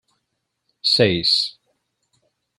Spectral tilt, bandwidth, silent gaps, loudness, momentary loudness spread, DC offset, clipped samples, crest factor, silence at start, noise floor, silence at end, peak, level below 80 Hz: -4 dB/octave; 15.5 kHz; none; -17 LUFS; 8 LU; under 0.1%; under 0.1%; 20 dB; 0.85 s; -76 dBFS; 1.1 s; -4 dBFS; -60 dBFS